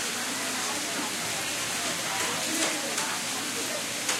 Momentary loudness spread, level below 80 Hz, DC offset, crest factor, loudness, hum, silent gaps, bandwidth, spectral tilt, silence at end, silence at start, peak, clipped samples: 3 LU; -68 dBFS; under 0.1%; 20 dB; -28 LUFS; none; none; 16 kHz; -0.5 dB/octave; 0 s; 0 s; -10 dBFS; under 0.1%